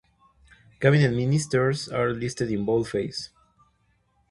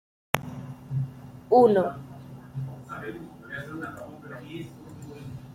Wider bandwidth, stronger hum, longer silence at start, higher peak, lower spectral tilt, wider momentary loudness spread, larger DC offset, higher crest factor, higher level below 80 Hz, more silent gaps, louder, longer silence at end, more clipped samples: second, 11.5 kHz vs 16.5 kHz; neither; first, 0.8 s vs 0.35 s; second, -4 dBFS vs 0 dBFS; about the same, -6 dB/octave vs -6.5 dB/octave; second, 10 LU vs 22 LU; neither; second, 22 dB vs 28 dB; first, -54 dBFS vs -60 dBFS; neither; first, -24 LUFS vs -27 LUFS; first, 1.05 s vs 0 s; neither